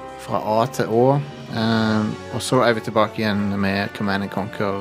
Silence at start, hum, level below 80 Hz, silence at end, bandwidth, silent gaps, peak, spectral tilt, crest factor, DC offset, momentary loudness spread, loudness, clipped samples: 0 s; none; -58 dBFS; 0 s; 15.5 kHz; none; -2 dBFS; -6 dB/octave; 20 dB; under 0.1%; 8 LU; -21 LUFS; under 0.1%